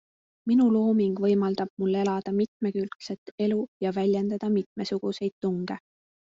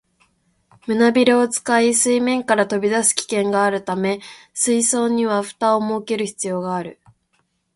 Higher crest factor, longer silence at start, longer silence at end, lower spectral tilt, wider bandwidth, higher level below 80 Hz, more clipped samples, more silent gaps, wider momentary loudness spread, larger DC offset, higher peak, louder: about the same, 14 dB vs 18 dB; second, 0.45 s vs 0.85 s; second, 0.6 s vs 0.85 s; first, -7.5 dB/octave vs -3 dB/octave; second, 7.6 kHz vs 12 kHz; about the same, -68 dBFS vs -64 dBFS; neither; first, 1.70-1.77 s, 2.48-2.60 s, 2.96-3.00 s, 3.18-3.38 s, 3.68-3.80 s, 4.66-4.76 s, 5.32-5.41 s vs none; about the same, 11 LU vs 9 LU; neither; second, -12 dBFS vs 0 dBFS; second, -27 LUFS vs -18 LUFS